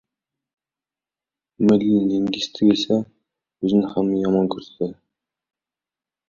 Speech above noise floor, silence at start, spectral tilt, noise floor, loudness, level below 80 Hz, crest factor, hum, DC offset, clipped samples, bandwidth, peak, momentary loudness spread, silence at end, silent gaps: over 71 dB; 1.6 s; -7 dB/octave; under -90 dBFS; -20 LUFS; -58 dBFS; 18 dB; none; under 0.1%; under 0.1%; 7.2 kHz; -4 dBFS; 11 LU; 1.35 s; none